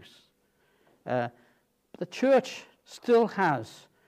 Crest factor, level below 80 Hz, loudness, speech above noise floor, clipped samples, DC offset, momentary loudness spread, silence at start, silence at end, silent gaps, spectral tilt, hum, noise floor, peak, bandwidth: 18 dB; -80 dBFS; -27 LUFS; 43 dB; under 0.1%; under 0.1%; 20 LU; 1.05 s; 0.4 s; none; -6 dB/octave; none; -69 dBFS; -12 dBFS; 14 kHz